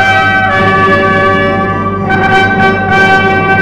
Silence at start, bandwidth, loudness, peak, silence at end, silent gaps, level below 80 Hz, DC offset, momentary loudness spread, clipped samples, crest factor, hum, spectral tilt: 0 s; 12.5 kHz; -8 LUFS; 0 dBFS; 0 s; none; -34 dBFS; 1%; 5 LU; under 0.1%; 8 dB; none; -6 dB/octave